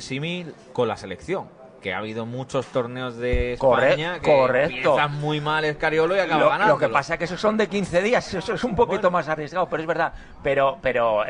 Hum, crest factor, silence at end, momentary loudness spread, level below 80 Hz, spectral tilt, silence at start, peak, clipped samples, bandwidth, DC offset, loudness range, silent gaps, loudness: none; 18 dB; 0 s; 11 LU; -42 dBFS; -5.5 dB/octave; 0 s; -4 dBFS; under 0.1%; 10 kHz; under 0.1%; 5 LU; none; -22 LUFS